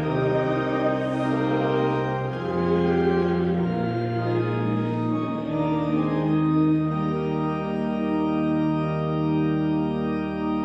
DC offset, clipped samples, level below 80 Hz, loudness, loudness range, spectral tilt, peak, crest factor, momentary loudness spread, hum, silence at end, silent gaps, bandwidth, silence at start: under 0.1%; under 0.1%; -50 dBFS; -24 LUFS; 1 LU; -9 dB/octave; -10 dBFS; 14 dB; 5 LU; none; 0 s; none; 6.6 kHz; 0 s